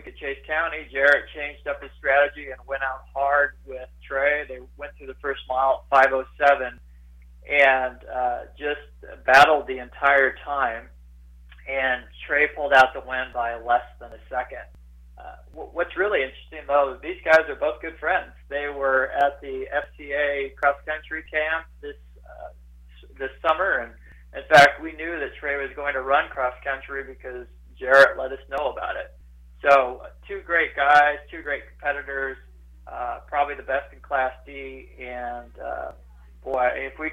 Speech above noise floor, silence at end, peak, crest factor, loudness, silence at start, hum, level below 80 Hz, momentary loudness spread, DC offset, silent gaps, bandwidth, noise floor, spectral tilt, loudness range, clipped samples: 24 dB; 0 s; -6 dBFS; 18 dB; -22 LUFS; 0 s; none; -48 dBFS; 20 LU; under 0.1%; none; 15.5 kHz; -47 dBFS; -4 dB/octave; 7 LU; under 0.1%